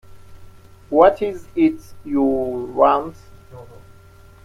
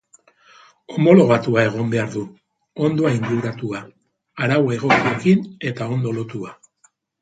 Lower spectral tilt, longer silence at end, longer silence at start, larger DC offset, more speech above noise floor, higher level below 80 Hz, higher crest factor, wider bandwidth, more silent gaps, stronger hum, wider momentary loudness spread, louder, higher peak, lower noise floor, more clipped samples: about the same, -7.5 dB/octave vs -7.5 dB/octave; about the same, 0.75 s vs 0.7 s; second, 0.1 s vs 0.9 s; neither; second, 27 dB vs 42 dB; first, -48 dBFS vs -58 dBFS; about the same, 20 dB vs 20 dB; first, 13 kHz vs 9.2 kHz; neither; neither; second, 11 LU vs 17 LU; about the same, -18 LUFS vs -19 LUFS; about the same, 0 dBFS vs 0 dBFS; second, -45 dBFS vs -60 dBFS; neither